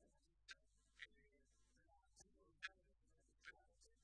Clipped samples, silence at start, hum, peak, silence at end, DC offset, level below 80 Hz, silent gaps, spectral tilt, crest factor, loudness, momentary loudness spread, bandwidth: under 0.1%; 0 s; none; -34 dBFS; 0 s; under 0.1%; -82 dBFS; none; -1 dB/octave; 32 dB; -61 LUFS; 8 LU; 9.6 kHz